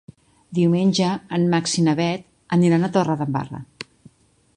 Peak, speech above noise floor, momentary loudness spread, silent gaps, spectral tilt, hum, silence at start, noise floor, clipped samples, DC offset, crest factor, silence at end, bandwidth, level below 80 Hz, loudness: -4 dBFS; 34 dB; 17 LU; none; -6 dB/octave; none; 0.5 s; -53 dBFS; under 0.1%; under 0.1%; 18 dB; 0.75 s; 10.5 kHz; -58 dBFS; -20 LUFS